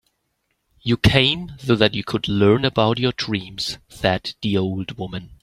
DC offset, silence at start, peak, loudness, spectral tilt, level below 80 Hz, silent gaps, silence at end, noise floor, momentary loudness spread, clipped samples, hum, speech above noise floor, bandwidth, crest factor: under 0.1%; 0.85 s; -2 dBFS; -20 LUFS; -6 dB/octave; -42 dBFS; none; 0.1 s; -72 dBFS; 11 LU; under 0.1%; none; 52 dB; 14 kHz; 20 dB